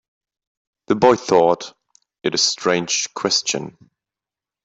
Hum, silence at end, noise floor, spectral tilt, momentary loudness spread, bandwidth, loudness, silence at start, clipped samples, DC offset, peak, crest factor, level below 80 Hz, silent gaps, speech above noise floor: none; 0.95 s; -89 dBFS; -2.5 dB/octave; 11 LU; 8.4 kHz; -18 LUFS; 0.9 s; under 0.1%; under 0.1%; -2 dBFS; 18 dB; -58 dBFS; none; 71 dB